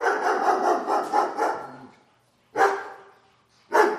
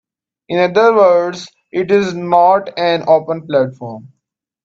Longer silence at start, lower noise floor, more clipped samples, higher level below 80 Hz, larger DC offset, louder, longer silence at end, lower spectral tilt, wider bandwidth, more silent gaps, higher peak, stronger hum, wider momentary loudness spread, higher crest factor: second, 0 s vs 0.5 s; second, -63 dBFS vs -74 dBFS; neither; second, -76 dBFS vs -60 dBFS; neither; second, -24 LUFS vs -14 LUFS; second, 0 s vs 0.65 s; second, -3 dB/octave vs -6 dB/octave; first, 15 kHz vs 7.8 kHz; neither; second, -6 dBFS vs 0 dBFS; neither; second, 12 LU vs 15 LU; first, 20 dB vs 14 dB